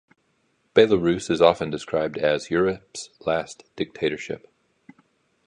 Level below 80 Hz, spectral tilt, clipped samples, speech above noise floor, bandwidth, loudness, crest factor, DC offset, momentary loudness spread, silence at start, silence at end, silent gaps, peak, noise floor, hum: -56 dBFS; -5 dB/octave; under 0.1%; 46 dB; 10.5 kHz; -23 LUFS; 22 dB; under 0.1%; 15 LU; 0.75 s; 1.1 s; none; -2 dBFS; -68 dBFS; none